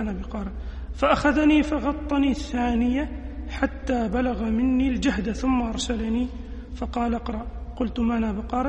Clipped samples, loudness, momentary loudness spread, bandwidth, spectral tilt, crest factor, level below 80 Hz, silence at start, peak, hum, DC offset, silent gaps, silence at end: under 0.1%; -25 LUFS; 14 LU; 9 kHz; -6 dB/octave; 18 dB; -34 dBFS; 0 s; -6 dBFS; none; under 0.1%; none; 0 s